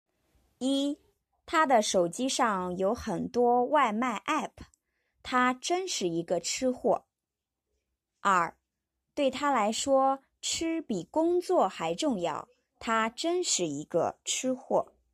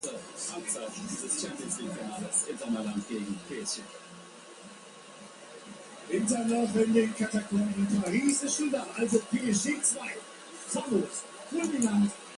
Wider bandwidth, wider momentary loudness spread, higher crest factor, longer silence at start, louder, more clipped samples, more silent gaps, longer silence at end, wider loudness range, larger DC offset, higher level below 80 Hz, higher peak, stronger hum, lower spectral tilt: first, 14.5 kHz vs 11.5 kHz; second, 7 LU vs 20 LU; about the same, 18 dB vs 20 dB; first, 0.6 s vs 0 s; about the same, -29 LUFS vs -30 LUFS; neither; neither; first, 0.3 s vs 0 s; second, 4 LU vs 9 LU; neither; about the same, -64 dBFS vs -68 dBFS; about the same, -12 dBFS vs -12 dBFS; neither; about the same, -3 dB/octave vs -4 dB/octave